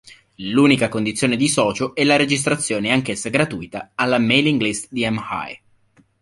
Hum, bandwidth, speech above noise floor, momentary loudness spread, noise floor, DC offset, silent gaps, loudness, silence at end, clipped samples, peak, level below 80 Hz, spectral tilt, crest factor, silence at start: none; 11.5 kHz; 38 dB; 11 LU; -57 dBFS; under 0.1%; none; -18 LUFS; 0.65 s; under 0.1%; -2 dBFS; -54 dBFS; -4 dB/octave; 18 dB; 0.05 s